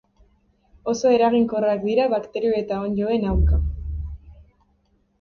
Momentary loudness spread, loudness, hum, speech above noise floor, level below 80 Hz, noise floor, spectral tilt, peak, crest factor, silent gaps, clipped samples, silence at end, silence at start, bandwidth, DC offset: 15 LU; -22 LUFS; none; 44 dB; -30 dBFS; -64 dBFS; -7.5 dB/octave; -6 dBFS; 16 dB; none; under 0.1%; 0.8 s; 0.85 s; 7 kHz; under 0.1%